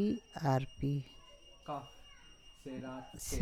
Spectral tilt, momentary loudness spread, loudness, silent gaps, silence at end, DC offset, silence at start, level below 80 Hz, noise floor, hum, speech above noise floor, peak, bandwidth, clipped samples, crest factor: -6 dB/octave; 23 LU; -39 LUFS; none; 0 s; under 0.1%; 0 s; -56 dBFS; -58 dBFS; none; 21 dB; -20 dBFS; 15.5 kHz; under 0.1%; 20 dB